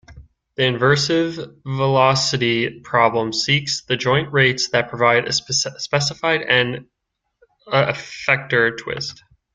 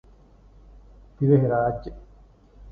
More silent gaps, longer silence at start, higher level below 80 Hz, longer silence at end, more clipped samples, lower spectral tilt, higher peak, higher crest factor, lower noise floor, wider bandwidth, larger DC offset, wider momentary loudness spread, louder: neither; second, 0.1 s vs 1.2 s; second, -54 dBFS vs -48 dBFS; first, 0.4 s vs 0 s; neither; second, -4 dB/octave vs -12 dB/octave; first, 0 dBFS vs -6 dBFS; about the same, 20 dB vs 20 dB; first, -75 dBFS vs -52 dBFS; first, 9.4 kHz vs 4.7 kHz; neither; second, 9 LU vs 17 LU; first, -18 LUFS vs -22 LUFS